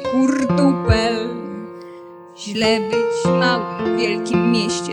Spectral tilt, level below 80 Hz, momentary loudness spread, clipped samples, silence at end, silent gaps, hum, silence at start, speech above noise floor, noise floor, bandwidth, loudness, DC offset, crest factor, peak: -5.5 dB/octave; -38 dBFS; 16 LU; under 0.1%; 0 s; none; none; 0 s; 20 dB; -38 dBFS; 10.5 kHz; -18 LUFS; under 0.1%; 16 dB; -2 dBFS